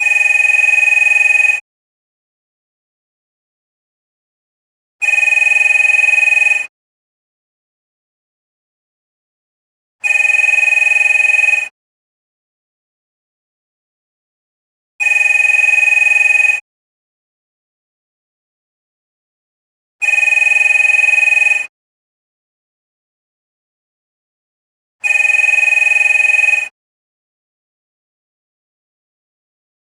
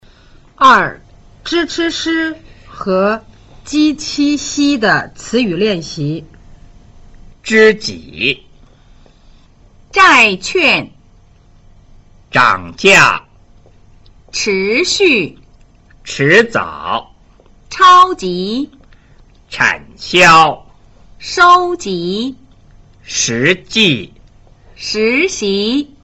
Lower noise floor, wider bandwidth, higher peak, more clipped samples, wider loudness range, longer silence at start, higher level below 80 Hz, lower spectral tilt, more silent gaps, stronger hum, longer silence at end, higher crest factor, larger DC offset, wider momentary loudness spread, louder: first, under -90 dBFS vs -45 dBFS; first, over 20 kHz vs 14.5 kHz; about the same, -2 dBFS vs 0 dBFS; neither; first, 9 LU vs 5 LU; second, 0 s vs 0.6 s; second, -80 dBFS vs -44 dBFS; second, 3 dB/octave vs -3.5 dB/octave; first, 1.61-4.99 s, 6.69-9.99 s, 11.71-14.99 s, 16.61-19.99 s, 21.69-24.99 s vs none; neither; first, 3.3 s vs 0.2 s; about the same, 14 dB vs 14 dB; neither; second, 8 LU vs 16 LU; first, -9 LUFS vs -12 LUFS